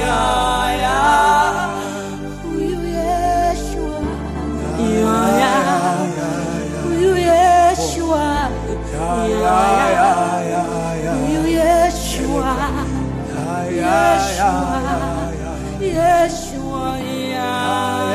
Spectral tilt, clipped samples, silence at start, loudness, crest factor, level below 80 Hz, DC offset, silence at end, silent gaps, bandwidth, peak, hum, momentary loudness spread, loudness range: -5 dB/octave; under 0.1%; 0 s; -17 LUFS; 14 dB; -30 dBFS; under 0.1%; 0 s; none; 15.5 kHz; -2 dBFS; none; 10 LU; 4 LU